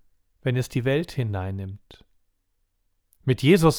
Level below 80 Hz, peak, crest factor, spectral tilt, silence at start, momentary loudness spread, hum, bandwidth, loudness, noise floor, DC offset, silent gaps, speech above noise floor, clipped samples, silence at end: -50 dBFS; -4 dBFS; 22 dB; -6.5 dB/octave; 0.45 s; 15 LU; none; 18.5 kHz; -25 LUFS; -72 dBFS; under 0.1%; none; 49 dB; under 0.1%; 0 s